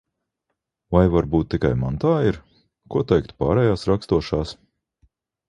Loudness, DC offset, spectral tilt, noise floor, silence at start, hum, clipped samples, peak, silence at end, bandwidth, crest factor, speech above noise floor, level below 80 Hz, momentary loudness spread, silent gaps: -21 LUFS; under 0.1%; -8.5 dB/octave; -79 dBFS; 0.9 s; none; under 0.1%; -2 dBFS; 0.95 s; 11 kHz; 20 dB; 59 dB; -36 dBFS; 8 LU; none